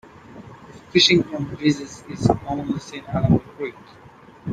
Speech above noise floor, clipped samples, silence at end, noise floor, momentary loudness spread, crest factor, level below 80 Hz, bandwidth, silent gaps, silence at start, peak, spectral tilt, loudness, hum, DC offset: 21 dB; under 0.1%; 0 s; -43 dBFS; 21 LU; 20 dB; -46 dBFS; 9.4 kHz; none; 0.3 s; -2 dBFS; -5 dB/octave; -21 LUFS; none; under 0.1%